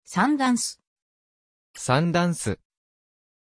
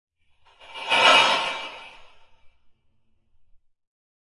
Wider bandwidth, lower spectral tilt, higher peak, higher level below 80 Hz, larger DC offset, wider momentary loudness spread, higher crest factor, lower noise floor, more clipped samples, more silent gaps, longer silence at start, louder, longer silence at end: about the same, 11 kHz vs 11.5 kHz; first, -5 dB/octave vs -0.5 dB/octave; second, -8 dBFS vs -4 dBFS; about the same, -60 dBFS vs -64 dBFS; neither; second, 11 LU vs 22 LU; about the same, 20 dB vs 22 dB; first, under -90 dBFS vs -63 dBFS; neither; first, 0.87-0.96 s, 1.02-1.74 s vs none; second, 0.1 s vs 0.7 s; second, -24 LUFS vs -18 LUFS; second, 0.95 s vs 1.75 s